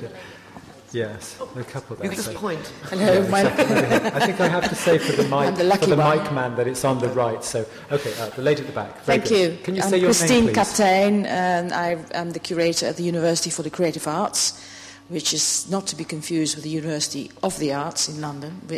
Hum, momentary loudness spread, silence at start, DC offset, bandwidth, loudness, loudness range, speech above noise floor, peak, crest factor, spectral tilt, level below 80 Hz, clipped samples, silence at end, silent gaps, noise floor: none; 13 LU; 0 s; under 0.1%; 16 kHz; -21 LUFS; 5 LU; 22 dB; -6 dBFS; 14 dB; -4 dB/octave; -54 dBFS; under 0.1%; 0 s; none; -43 dBFS